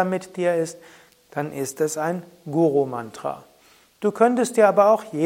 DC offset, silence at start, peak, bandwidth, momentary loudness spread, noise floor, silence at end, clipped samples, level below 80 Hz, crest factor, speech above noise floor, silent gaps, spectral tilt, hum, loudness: under 0.1%; 0 s; -2 dBFS; 16.5 kHz; 14 LU; -56 dBFS; 0 s; under 0.1%; -72 dBFS; 20 dB; 34 dB; none; -5.5 dB/octave; none; -22 LUFS